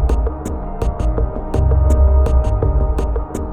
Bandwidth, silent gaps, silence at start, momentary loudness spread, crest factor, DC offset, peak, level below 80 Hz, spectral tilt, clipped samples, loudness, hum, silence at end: 9 kHz; none; 0 s; 9 LU; 12 dB; under 0.1%; -2 dBFS; -16 dBFS; -8.5 dB/octave; under 0.1%; -18 LUFS; none; 0 s